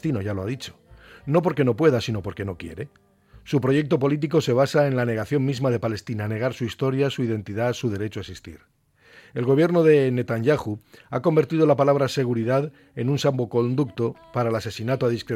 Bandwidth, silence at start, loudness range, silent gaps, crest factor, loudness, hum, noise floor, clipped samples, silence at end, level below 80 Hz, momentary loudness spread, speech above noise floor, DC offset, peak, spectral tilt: 15.5 kHz; 0.05 s; 5 LU; none; 18 dB; -23 LUFS; none; -52 dBFS; under 0.1%; 0 s; -56 dBFS; 13 LU; 30 dB; under 0.1%; -6 dBFS; -7 dB/octave